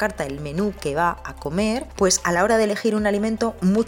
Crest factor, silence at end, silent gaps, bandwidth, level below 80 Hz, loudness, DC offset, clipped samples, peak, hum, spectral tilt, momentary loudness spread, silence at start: 16 dB; 0 s; none; 17 kHz; -42 dBFS; -22 LUFS; under 0.1%; under 0.1%; -6 dBFS; none; -4.5 dB/octave; 8 LU; 0 s